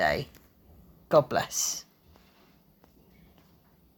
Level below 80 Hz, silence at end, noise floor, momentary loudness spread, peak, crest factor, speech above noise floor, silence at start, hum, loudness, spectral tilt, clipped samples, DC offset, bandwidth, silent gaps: -58 dBFS; 2.15 s; -61 dBFS; 13 LU; -8 dBFS; 24 dB; 35 dB; 0 s; none; -27 LUFS; -3 dB/octave; under 0.1%; under 0.1%; 19 kHz; none